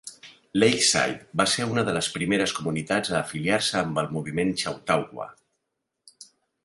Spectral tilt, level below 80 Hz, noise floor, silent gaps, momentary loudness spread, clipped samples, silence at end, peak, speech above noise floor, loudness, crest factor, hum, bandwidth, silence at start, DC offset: -3.5 dB/octave; -58 dBFS; -81 dBFS; none; 9 LU; under 0.1%; 0.4 s; -6 dBFS; 56 dB; -24 LUFS; 20 dB; none; 11.5 kHz; 0.05 s; under 0.1%